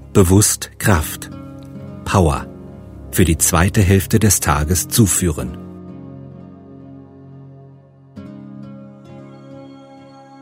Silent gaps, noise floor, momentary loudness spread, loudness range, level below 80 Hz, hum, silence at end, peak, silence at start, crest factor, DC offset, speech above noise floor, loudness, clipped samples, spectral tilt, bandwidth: none; -44 dBFS; 25 LU; 22 LU; -32 dBFS; none; 0.65 s; 0 dBFS; 0.05 s; 18 dB; under 0.1%; 30 dB; -15 LUFS; under 0.1%; -4.5 dB/octave; 16.5 kHz